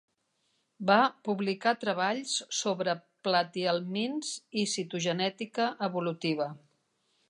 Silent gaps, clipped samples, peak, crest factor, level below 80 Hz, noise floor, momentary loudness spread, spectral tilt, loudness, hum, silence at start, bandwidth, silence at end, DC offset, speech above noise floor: none; under 0.1%; -10 dBFS; 20 dB; -82 dBFS; -76 dBFS; 7 LU; -3.5 dB/octave; -30 LUFS; none; 0.8 s; 11.5 kHz; 0.7 s; under 0.1%; 46 dB